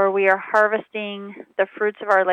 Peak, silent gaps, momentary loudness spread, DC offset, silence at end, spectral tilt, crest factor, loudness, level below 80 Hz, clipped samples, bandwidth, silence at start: -4 dBFS; none; 13 LU; under 0.1%; 0 s; -5.5 dB/octave; 16 dB; -21 LUFS; -80 dBFS; under 0.1%; 9 kHz; 0 s